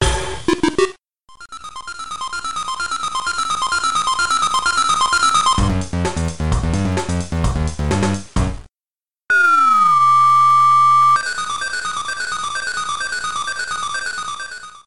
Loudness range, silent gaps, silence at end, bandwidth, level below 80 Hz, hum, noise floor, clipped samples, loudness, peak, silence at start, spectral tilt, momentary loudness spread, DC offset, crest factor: 9 LU; none; 0 s; 12 kHz; -30 dBFS; none; under -90 dBFS; under 0.1%; -17 LUFS; -4 dBFS; 0 s; -3.5 dB/octave; 14 LU; 2%; 14 dB